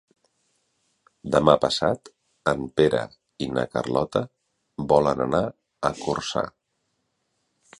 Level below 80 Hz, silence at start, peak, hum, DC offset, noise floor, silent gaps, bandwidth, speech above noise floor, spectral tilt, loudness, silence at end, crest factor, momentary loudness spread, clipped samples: -52 dBFS; 1.25 s; -2 dBFS; none; under 0.1%; -75 dBFS; none; 11.5 kHz; 52 dB; -5.5 dB/octave; -24 LUFS; 1.3 s; 24 dB; 14 LU; under 0.1%